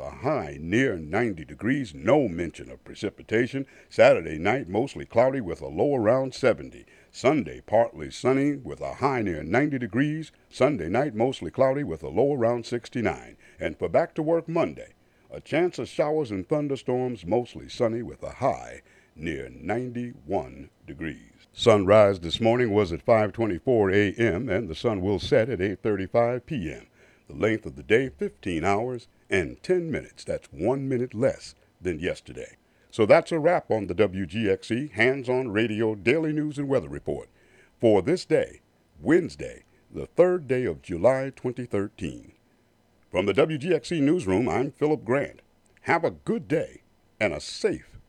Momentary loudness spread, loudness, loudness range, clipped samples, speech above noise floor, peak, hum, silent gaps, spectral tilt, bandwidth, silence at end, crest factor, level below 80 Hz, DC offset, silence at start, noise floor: 13 LU; -25 LUFS; 5 LU; under 0.1%; 38 dB; -4 dBFS; none; none; -6.5 dB/octave; 11 kHz; 0.1 s; 20 dB; -54 dBFS; under 0.1%; 0 s; -63 dBFS